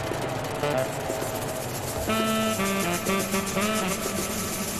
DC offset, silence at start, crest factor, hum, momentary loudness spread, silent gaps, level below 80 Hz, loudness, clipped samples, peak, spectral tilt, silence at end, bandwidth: under 0.1%; 0 s; 16 dB; none; 5 LU; none; -46 dBFS; -27 LUFS; under 0.1%; -12 dBFS; -3.5 dB/octave; 0 s; 14.5 kHz